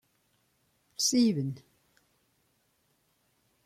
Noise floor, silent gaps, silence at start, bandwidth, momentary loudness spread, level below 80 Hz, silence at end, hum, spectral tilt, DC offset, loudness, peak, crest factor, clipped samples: -73 dBFS; none; 1 s; 15.5 kHz; 21 LU; -76 dBFS; 2.05 s; none; -4 dB/octave; under 0.1%; -28 LUFS; -14 dBFS; 22 dB; under 0.1%